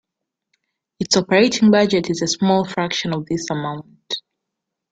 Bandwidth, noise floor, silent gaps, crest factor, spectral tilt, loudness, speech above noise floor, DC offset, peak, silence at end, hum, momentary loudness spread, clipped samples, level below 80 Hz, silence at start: 9.2 kHz; -82 dBFS; none; 18 dB; -4.5 dB/octave; -18 LUFS; 64 dB; under 0.1%; -2 dBFS; 0.7 s; none; 14 LU; under 0.1%; -58 dBFS; 1 s